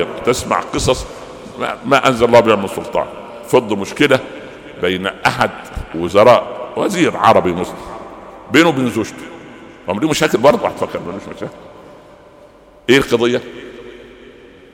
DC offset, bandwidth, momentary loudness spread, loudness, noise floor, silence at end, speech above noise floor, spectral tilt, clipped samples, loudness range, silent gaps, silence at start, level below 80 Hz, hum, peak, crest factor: under 0.1%; 18 kHz; 22 LU; -15 LUFS; -43 dBFS; 0.45 s; 29 dB; -4.5 dB/octave; under 0.1%; 4 LU; none; 0 s; -40 dBFS; none; 0 dBFS; 16 dB